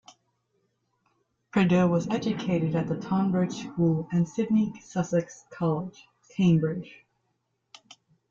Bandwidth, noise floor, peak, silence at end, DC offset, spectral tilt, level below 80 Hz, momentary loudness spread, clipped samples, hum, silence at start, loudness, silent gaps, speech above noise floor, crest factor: 7.6 kHz; -76 dBFS; -12 dBFS; 1.35 s; under 0.1%; -7.5 dB/octave; -62 dBFS; 9 LU; under 0.1%; none; 1.55 s; -27 LUFS; none; 51 dB; 16 dB